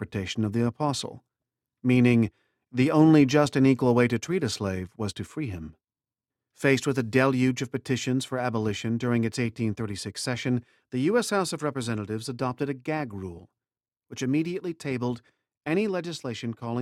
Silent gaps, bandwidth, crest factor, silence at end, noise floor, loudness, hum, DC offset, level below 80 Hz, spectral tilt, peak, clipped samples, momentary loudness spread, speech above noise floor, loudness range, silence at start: none; 14 kHz; 20 dB; 0 s; under -90 dBFS; -26 LUFS; none; under 0.1%; -60 dBFS; -6 dB/octave; -6 dBFS; under 0.1%; 13 LU; over 64 dB; 9 LU; 0 s